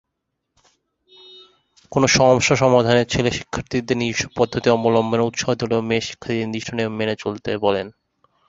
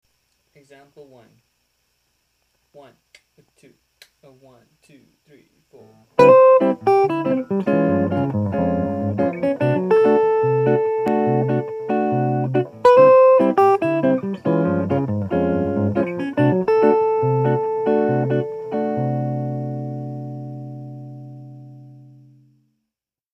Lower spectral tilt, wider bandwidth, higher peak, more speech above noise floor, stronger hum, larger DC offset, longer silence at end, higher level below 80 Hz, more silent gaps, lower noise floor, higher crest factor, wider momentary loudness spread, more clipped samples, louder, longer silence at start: second, -4.5 dB/octave vs -9 dB/octave; about the same, 8 kHz vs 7.6 kHz; about the same, -2 dBFS vs 0 dBFS; second, 58 dB vs 63 dB; neither; neither; second, 0.6 s vs 1.4 s; first, -48 dBFS vs -58 dBFS; neither; second, -77 dBFS vs -83 dBFS; about the same, 20 dB vs 20 dB; second, 11 LU vs 17 LU; neither; about the same, -19 LUFS vs -18 LUFS; first, 1.3 s vs 1 s